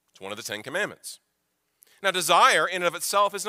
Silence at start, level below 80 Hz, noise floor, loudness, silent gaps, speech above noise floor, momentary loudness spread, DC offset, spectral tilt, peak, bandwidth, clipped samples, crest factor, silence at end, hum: 0.2 s; -82 dBFS; -76 dBFS; -23 LUFS; none; 51 dB; 19 LU; under 0.1%; -1.5 dB/octave; -4 dBFS; 16 kHz; under 0.1%; 22 dB; 0 s; none